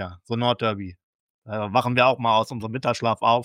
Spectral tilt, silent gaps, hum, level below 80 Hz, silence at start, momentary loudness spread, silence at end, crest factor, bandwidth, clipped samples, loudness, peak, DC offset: -5.5 dB/octave; 1.03-1.42 s; none; -60 dBFS; 0 s; 13 LU; 0 s; 18 dB; 15 kHz; under 0.1%; -23 LUFS; -4 dBFS; under 0.1%